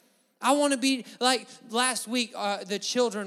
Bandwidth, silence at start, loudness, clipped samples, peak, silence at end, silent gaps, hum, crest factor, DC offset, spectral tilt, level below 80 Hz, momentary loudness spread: 15.5 kHz; 0.4 s; -27 LUFS; under 0.1%; -8 dBFS; 0 s; none; none; 20 dB; under 0.1%; -2 dB/octave; -88 dBFS; 6 LU